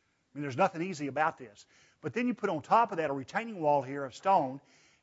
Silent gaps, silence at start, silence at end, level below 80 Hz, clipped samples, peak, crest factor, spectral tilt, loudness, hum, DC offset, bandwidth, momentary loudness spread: none; 0.35 s; 0.45 s; -80 dBFS; under 0.1%; -12 dBFS; 20 dB; -6 dB/octave; -31 LUFS; none; under 0.1%; 8 kHz; 15 LU